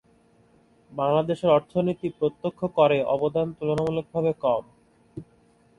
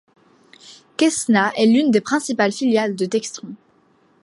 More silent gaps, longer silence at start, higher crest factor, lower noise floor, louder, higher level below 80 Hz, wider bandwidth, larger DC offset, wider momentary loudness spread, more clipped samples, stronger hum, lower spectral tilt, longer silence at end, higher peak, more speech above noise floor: neither; first, 0.9 s vs 0.7 s; about the same, 20 dB vs 18 dB; about the same, -60 dBFS vs -58 dBFS; second, -25 LUFS vs -18 LUFS; first, -60 dBFS vs -70 dBFS; about the same, 11 kHz vs 11.5 kHz; neither; about the same, 16 LU vs 16 LU; neither; neither; first, -8 dB/octave vs -4 dB/octave; second, 0.55 s vs 0.7 s; second, -6 dBFS vs -2 dBFS; second, 36 dB vs 40 dB